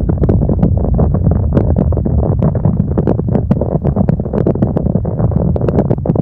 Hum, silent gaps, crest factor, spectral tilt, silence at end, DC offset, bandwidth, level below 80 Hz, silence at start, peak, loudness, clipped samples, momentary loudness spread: none; none; 12 dB; -13 dB/octave; 0 s; 1%; 3.2 kHz; -20 dBFS; 0 s; 0 dBFS; -14 LUFS; under 0.1%; 2 LU